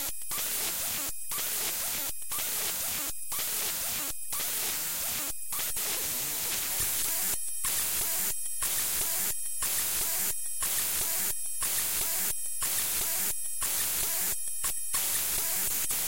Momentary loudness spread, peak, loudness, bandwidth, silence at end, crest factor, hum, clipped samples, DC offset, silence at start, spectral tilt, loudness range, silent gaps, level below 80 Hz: 5 LU; -14 dBFS; -28 LUFS; 16.5 kHz; 0 s; 16 dB; none; under 0.1%; 1%; 0 s; 0.5 dB/octave; 2 LU; none; -54 dBFS